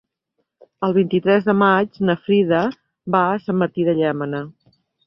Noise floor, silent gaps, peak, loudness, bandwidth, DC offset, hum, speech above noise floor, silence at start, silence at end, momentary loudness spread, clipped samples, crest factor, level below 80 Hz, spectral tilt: -74 dBFS; none; -2 dBFS; -19 LUFS; 5.8 kHz; under 0.1%; none; 56 dB; 0.8 s; 0.55 s; 10 LU; under 0.1%; 18 dB; -60 dBFS; -9.5 dB/octave